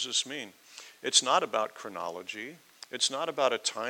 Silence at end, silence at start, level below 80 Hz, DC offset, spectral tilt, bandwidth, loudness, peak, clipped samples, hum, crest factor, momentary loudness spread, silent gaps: 0 s; 0 s; under -90 dBFS; under 0.1%; 0 dB/octave; 18.5 kHz; -29 LUFS; -8 dBFS; under 0.1%; none; 22 dB; 20 LU; none